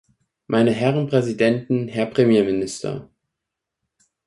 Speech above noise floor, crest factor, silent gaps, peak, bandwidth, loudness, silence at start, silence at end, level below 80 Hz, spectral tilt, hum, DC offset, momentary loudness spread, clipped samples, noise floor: 64 dB; 18 dB; none; -4 dBFS; 11.5 kHz; -20 LUFS; 0.5 s; 1.2 s; -58 dBFS; -6.5 dB/octave; none; under 0.1%; 11 LU; under 0.1%; -83 dBFS